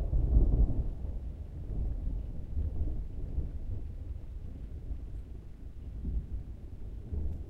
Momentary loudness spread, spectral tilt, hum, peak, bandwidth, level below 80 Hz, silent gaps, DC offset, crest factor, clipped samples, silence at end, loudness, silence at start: 16 LU; -10.5 dB/octave; none; -12 dBFS; 2.8 kHz; -34 dBFS; none; under 0.1%; 20 dB; under 0.1%; 0 s; -38 LUFS; 0 s